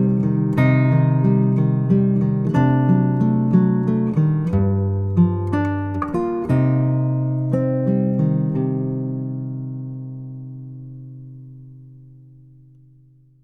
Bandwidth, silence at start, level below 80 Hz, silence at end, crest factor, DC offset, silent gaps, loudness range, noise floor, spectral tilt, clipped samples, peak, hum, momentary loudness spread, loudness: 4 kHz; 0 s; -48 dBFS; 1.4 s; 16 dB; under 0.1%; none; 16 LU; -51 dBFS; -11 dB/octave; under 0.1%; -2 dBFS; none; 17 LU; -19 LUFS